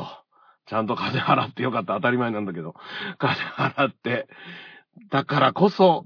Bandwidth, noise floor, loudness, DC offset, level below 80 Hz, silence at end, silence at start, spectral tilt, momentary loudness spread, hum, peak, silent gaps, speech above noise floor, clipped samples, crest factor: 5.4 kHz; -57 dBFS; -23 LUFS; under 0.1%; -72 dBFS; 0 s; 0 s; -7.5 dB/octave; 16 LU; none; -4 dBFS; none; 34 dB; under 0.1%; 20 dB